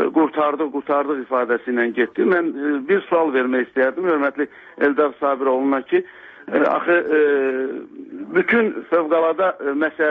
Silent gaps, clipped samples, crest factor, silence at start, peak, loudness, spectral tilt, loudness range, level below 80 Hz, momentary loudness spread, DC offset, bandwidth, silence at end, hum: none; under 0.1%; 14 dB; 0 s; -4 dBFS; -19 LUFS; -8 dB/octave; 1 LU; -68 dBFS; 7 LU; under 0.1%; 4.5 kHz; 0 s; none